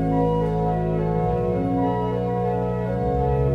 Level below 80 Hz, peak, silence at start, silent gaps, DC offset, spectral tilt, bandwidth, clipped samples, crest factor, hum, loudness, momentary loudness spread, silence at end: -34 dBFS; -10 dBFS; 0 s; none; under 0.1%; -10 dB/octave; 5.6 kHz; under 0.1%; 12 dB; none; -23 LUFS; 3 LU; 0 s